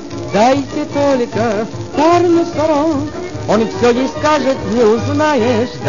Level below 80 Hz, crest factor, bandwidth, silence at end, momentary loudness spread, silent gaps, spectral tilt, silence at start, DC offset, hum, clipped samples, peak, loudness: -42 dBFS; 14 dB; 7.4 kHz; 0 s; 7 LU; none; -6 dB/octave; 0 s; 2%; none; under 0.1%; 0 dBFS; -14 LUFS